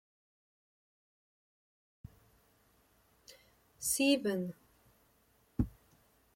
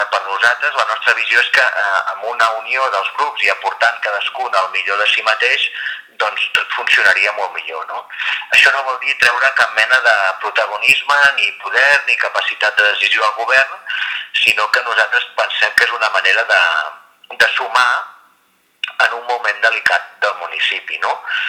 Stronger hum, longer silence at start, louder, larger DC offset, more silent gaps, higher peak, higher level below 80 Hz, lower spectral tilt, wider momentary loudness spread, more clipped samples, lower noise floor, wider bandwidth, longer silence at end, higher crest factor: neither; first, 3.3 s vs 0 s; second, -34 LUFS vs -14 LUFS; neither; neither; second, -18 dBFS vs 0 dBFS; first, -58 dBFS vs -64 dBFS; first, -4 dB/octave vs 1 dB/octave; first, 29 LU vs 9 LU; neither; first, -71 dBFS vs -57 dBFS; second, 16.5 kHz vs over 20 kHz; first, 0.65 s vs 0 s; first, 22 dB vs 16 dB